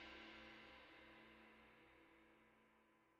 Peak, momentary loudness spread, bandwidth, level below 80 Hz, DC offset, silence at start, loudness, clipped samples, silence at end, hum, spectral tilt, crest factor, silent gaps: -46 dBFS; 10 LU; 7.6 kHz; -82 dBFS; under 0.1%; 0 s; -63 LUFS; under 0.1%; 0 s; none; -1.5 dB/octave; 18 dB; none